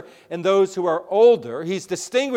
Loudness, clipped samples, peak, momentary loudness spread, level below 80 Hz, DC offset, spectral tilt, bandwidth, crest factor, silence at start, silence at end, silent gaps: -20 LUFS; under 0.1%; -6 dBFS; 12 LU; -72 dBFS; under 0.1%; -4.5 dB/octave; 12 kHz; 14 dB; 0.3 s; 0 s; none